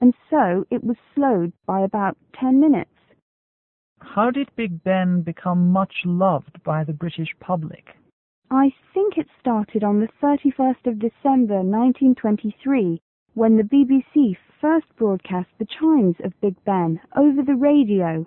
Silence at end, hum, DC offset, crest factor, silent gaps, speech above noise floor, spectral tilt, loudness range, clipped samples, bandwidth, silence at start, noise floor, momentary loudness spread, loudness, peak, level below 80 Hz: 0 s; none; under 0.1%; 16 dB; 3.22-3.96 s, 8.13-8.42 s, 13.02-13.26 s; over 71 dB; -12.5 dB/octave; 4 LU; under 0.1%; 4 kHz; 0 s; under -90 dBFS; 9 LU; -20 LUFS; -4 dBFS; -62 dBFS